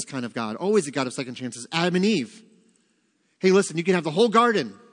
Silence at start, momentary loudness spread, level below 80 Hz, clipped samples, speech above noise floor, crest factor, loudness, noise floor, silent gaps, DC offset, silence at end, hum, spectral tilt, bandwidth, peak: 0 s; 11 LU; -76 dBFS; under 0.1%; 45 dB; 20 dB; -23 LUFS; -68 dBFS; none; under 0.1%; 0.2 s; none; -5 dB/octave; 10.5 kHz; -4 dBFS